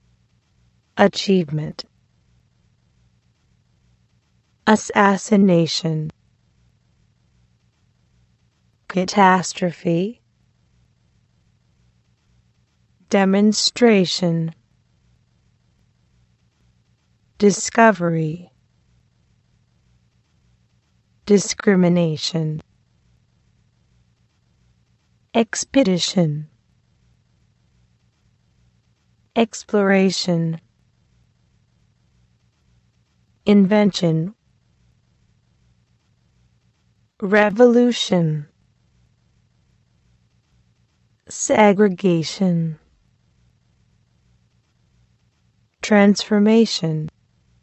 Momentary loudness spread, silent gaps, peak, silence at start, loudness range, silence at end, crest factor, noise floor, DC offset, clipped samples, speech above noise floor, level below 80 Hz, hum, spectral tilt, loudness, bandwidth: 14 LU; none; 0 dBFS; 0.95 s; 10 LU; 0.55 s; 22 dB; -63 dBFS; under 0.1%; under 0.1%; 46 dB; -62 dBFS; none; -5 dB/octave; -18 LUFS; 8.6 kHz